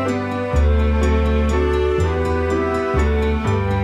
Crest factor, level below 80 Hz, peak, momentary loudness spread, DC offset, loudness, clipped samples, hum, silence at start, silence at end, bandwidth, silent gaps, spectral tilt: 12 dB; -22 dBFS; -6 dBFS; 2 LU; under 0.1%; -19 LUFS; under 0.1%; none; 0 s; 0 s; 8.8 kHz; none; -7.5 dB/octave